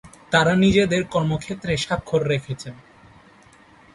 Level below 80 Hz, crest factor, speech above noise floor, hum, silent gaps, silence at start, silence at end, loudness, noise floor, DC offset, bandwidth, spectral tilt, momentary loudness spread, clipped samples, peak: -46 dBFS; 20 dB; 30 dB; none; none; 0.05 s; 1.2 s; -21 LUFS; -51 dBFS; under 0.1%; 11.5 kHz; -5.5 dB/octave; 13 LU; under 0.1%; -2 dBFS